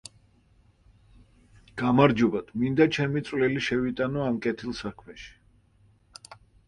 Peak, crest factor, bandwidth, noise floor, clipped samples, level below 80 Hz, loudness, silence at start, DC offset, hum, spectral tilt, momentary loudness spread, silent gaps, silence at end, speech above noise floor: -4 dBFS; 24 dB; 11 kHz; -61 dBFS; under 0.1%; -56 dBFS; -25 LUFS; 1.75 s; under 0.1%; none; -6.5 dB/octave; 25 LU; none; 0.35 s; 36 dB